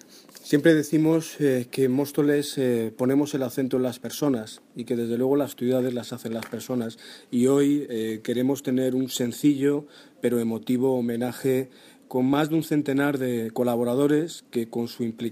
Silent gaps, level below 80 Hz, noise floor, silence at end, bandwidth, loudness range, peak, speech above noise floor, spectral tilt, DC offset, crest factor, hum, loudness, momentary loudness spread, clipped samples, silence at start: none; -70 dBFS; -46 dBFS; 0 s; 15.5 kHz; 3 LU; -6 dBFS; 22 dB; -6 dB/octave; under 0.1%; 18 dB; none; -25 LUFS; 9 LU; under 0.1%; 0.15 s